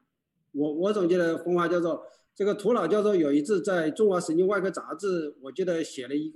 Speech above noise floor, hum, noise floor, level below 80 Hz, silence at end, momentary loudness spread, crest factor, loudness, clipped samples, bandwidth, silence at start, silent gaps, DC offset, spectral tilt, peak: 52 dB; none; -78 dBFS; -80 dBFS; 0.05 s; 8 LU; 14 dB; -26 LUFS; under 0.1%; 12 kHz; 0.55 s; none; under 0.1%; -6 dB/octave; -14 dBFS